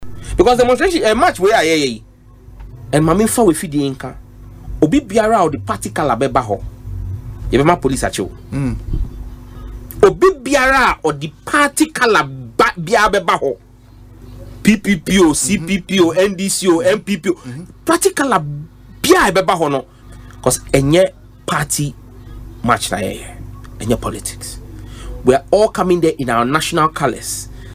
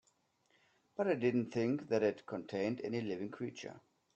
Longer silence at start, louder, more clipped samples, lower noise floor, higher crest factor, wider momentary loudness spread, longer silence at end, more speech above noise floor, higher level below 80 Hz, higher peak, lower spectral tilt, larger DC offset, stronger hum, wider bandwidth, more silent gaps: second, 0 s vs 1 s; first, -15 LUFS vs -37 LUFS; neither; second, -40 dBFS vs -76 dBFS; about the same, 16 dB vs 18 dB; first, 17 LU vs 11 LU; second, 0 s vs 0.35 s; second, 26 dB vs 39 dB; first, -34 dBFS vs -80 dBFS; first, 0 dBFS vs -20 dBFS; second, -4.5 dB/octave vs -7 dB/octave; neither; neither; first, 16 kHz vs 8.4 kHz; neither